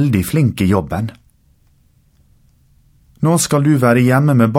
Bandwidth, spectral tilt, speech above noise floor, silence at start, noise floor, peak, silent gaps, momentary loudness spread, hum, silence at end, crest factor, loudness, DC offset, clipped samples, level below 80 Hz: 16.5 kHz; -6.5 dB/octave; 41 dB; 0 s; -54 dBFS; 0 dBFS; none; 10 LU; none; 0 s; 14 dB; -14 LUFS; under 0.1%; under 0.1%; -44 dBFS